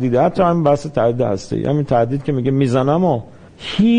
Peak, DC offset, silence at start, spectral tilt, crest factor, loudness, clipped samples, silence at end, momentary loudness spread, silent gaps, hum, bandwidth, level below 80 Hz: -2 dBFS; under 0.1%; 0 s; -8 dB/octave; 14 dB; -17 LUFS; under 0.1%; 0 s; 6 LU; none; none; 10 kHz; -44 dBFS